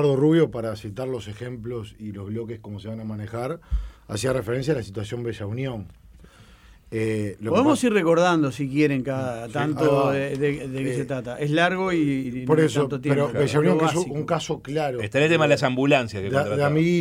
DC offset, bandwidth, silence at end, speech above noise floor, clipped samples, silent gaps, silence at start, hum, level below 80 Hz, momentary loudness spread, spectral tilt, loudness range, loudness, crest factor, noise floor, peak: under 0.1%; 15.5 kHz; 0 s; 27 dB; under 0.1%; none; 0 s; none; -44 dBFS; 13 LU; -6.5 dB/octave; 8 LU; -23 LUFS; 16 dB; -50 dBFS; -6 dBFS